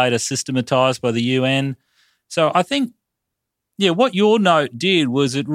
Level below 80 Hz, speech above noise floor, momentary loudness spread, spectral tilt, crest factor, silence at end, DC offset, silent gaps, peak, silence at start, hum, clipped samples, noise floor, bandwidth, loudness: -64 dBFS; 62 dB; 7 LU; -4.5 dB/octave; 18 dB; 0 s; under 0.1%; none; -2 dBFS; 0 s; none; under 0.1%; -80 dBFS; 15 kHz; -18 LUFS